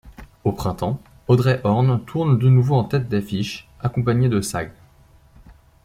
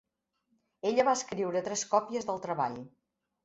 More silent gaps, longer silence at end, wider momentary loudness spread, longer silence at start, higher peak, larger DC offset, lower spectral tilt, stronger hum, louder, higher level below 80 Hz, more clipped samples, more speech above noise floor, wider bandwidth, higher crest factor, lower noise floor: neither; second, 0.35 s vs 0.55 s; first, 11 LU vs 8 LU; second, 0.05 s vs 0.85 s; first, -4 dBFS vs -12 dBFS; neither; first, -7 dB/octave vs -3.5 dB/octave; neither; first, -20 LUFS vs -31 LUFS; first, -46 dBFS vs -74 dBFS; neither; second, 33 dB vs 48 dB; first, 14.5 kHz vs 8.4 kHz; about the same, 18 dB vs 20 dB; second, -52 dBFS vs -79 dBFS